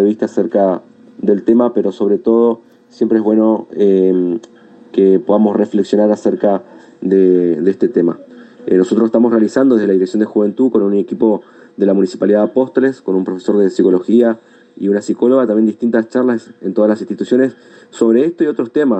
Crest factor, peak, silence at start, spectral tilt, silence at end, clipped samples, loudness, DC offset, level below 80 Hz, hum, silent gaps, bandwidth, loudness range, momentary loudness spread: 12 dB; 0 dBFS; 0 s; -8 dB/octave; 0 s; under 0.1%; -14 LUFS; under 0.1%; -64 dBFS; none; none; 8.6 kHz; 1 LU; 7 LU